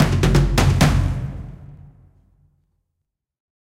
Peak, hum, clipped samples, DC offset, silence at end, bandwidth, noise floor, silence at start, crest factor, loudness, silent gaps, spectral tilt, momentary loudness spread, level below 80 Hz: -2 dBFS; none; under 0.1%; under 0.1%; 1.95 s; 16 kHz; -79 dBFS; 0 s; 20 dB; -18 LUFS; none; -6 dB/octave; 18 LU; -26 dBFS